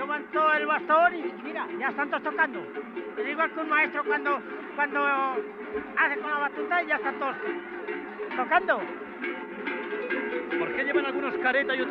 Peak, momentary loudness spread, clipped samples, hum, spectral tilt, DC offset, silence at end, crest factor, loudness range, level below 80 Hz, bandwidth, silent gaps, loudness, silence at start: -10 dBFS; 11 LU; under 0.1%; none; -6.5 dB/octave; under 0.1%; 0 s; 18 dB; 3 LU; -70 dBFS; 5.8 kHz; none; -27 LUFS; 0 s